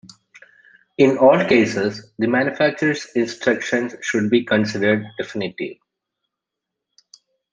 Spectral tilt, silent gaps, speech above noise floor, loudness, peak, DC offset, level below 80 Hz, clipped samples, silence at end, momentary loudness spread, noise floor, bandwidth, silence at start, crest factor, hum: -5.5 dB/octave; none; 64 dB; -19 LUFS; -2 dBFS; under 0.1%; -62 dBFS; under 0.1%; 1.8 s; 12 LU; -83 dBFS; 9.8 kHz; 1 s; 20 dB; none